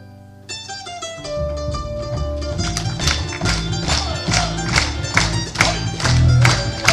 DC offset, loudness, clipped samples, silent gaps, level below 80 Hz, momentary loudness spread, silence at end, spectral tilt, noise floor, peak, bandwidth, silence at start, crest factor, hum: under 0.1%; -19 LUFS; under 0.1%; none; -28 dBFS; 14 LU; 0 s; -4 dB/octave; -40 dBFS; 0 dBFS; 14.5 kHz; 0 s; 20 dB; none